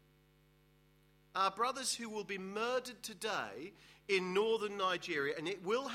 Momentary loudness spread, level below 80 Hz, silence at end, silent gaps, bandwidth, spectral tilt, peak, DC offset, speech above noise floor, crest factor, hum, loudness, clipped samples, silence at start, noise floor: 11 LU; -76 dBFS; 0 s; none; 16 kHz; -3 dB/octave; -20 dBFS; under 0.1%; 31 dB; 20 dB; none; -37 LUFS; under 0.1%; 1.35 s; -69 dBFS